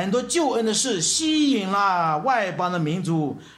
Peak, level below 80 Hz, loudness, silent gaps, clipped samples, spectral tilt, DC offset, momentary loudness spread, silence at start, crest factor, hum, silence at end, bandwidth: -10 dBFS; -60 dBFS; -22 LUFS; none; under 0.1%; -3.5 dB/octave; under 0.1%; 5 LU; 0 s; 12 dB; none; 0.05 s; 14.5 kHz